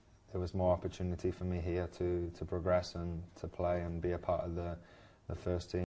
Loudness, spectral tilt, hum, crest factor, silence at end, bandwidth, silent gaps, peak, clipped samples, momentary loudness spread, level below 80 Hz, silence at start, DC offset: -38 LUFS; -7.5 dB/octave; none; 18 dB; 0.05 s; 8 kHz; none; -20 dBFS; under 0.1%; 11 LU; -48 dBFS; 0.3 s; under 0.1%